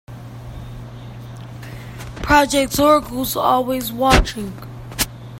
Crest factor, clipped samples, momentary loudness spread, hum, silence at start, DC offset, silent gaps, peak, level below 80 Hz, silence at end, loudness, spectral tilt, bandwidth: 20 dB; under 0.1%; 20 LU; none; 0.1 s; under 0.1%; none; 0 dBFS; -30 dBFS; 0 s; -17 LUFS; -4 dB/octave; 16.5 kHz